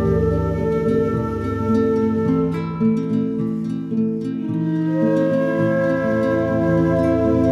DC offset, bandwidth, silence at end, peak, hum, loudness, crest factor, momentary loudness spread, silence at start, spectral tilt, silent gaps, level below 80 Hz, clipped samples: under 0.1%; 7.6 kHz; 0 s; -6 dBFS; none; -20 LUFS; 12 dB; 5 LU; 0 s; -9.5 dB/octave; none; -38 dBFS; under 0.1%